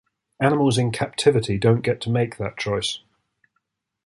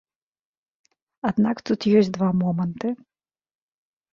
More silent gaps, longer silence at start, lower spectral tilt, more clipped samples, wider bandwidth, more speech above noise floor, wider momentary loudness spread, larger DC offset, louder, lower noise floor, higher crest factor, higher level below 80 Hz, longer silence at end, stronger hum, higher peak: neither; second, 0.4 s vs 1.25 s; second, -5.5 dB/octave vs -8 dB/octave; neither; first, 11.5 kHz vs 7.2 kHz; second, 54 dB vs over 69 dB; second, 7 LU vs 11 LU; neither; about the same, -22 LUFS vs -23 LUFS; second, -75 dBFS vs under -90 dBFS; about the same, 20 dB vs 18 dB; first, -50 dBFS vs -62 dBFS; about the same, 1.1 s vs 1.2 s; neither; about the same, -4 dBFS vs -6 dBFS